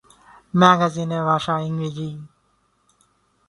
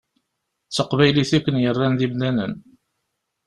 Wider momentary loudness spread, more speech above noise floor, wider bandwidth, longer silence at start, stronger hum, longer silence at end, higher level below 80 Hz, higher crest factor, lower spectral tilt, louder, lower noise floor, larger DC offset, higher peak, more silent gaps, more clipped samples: first, 16 LU vs 10 LU; second, 45 dB vs 58 dB; about the same, 11.5 kHz vs 11.5 kHz; second, 0.55 s vs 0.7 s; first, 50 Hz at -60 dBFS vs none; first, 1.2 s vs 0.85 s; second, -60 dBFS vs -52 dBFS; about the same, 22 dB vs 20 dB; about the same, -6 dB/octave vs -6 dB/octave; about the same, -20 LUFS vs -20 LUFS; second, -65 dBFS vs -77 dBFS; neither; about the same, 0 dBFS vs -2 dBFS; neither; neither